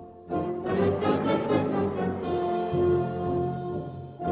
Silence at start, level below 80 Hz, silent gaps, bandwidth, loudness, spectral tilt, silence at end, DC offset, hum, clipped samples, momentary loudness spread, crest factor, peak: 0 s; -48 dBFS; none; 4 kHz; -27 LUFS; -7 dB/octave; 0 s; under 0.1%; none; under 0.1%; 9 LU; 16 dB; -10 dBFS